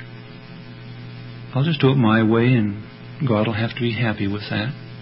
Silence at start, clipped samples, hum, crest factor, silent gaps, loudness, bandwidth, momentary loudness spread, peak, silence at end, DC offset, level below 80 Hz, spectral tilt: 0 s; under 0.1%; none; 18 dB; none; -20 LUFS; 5.8 kHz; 22 LU; -4 dBFS; 0 s; under 0.1%; -50 dBFS; -12 dB/octave